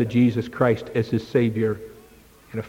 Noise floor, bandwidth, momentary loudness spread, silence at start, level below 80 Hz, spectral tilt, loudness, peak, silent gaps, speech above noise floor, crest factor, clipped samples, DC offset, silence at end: -50 dBFS; 16 kHz; 14 LU; 0 s; -54 dBFS; -8.5 dB/octave; -22 LUFS; -6 dBFS; none; 29 dB; 16 dB; under 0.1%; under 0.1%; 0 s